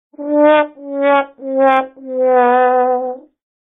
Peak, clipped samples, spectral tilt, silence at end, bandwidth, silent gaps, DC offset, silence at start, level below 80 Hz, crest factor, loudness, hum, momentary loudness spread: 0 dBFS; under 0.1%; -6 dB/octave; 0.45 s; 4 kHz; none; under 0.1%; 0.2 s; -70 dBFS; 14 dB; -14 LUFS; none; 10 LU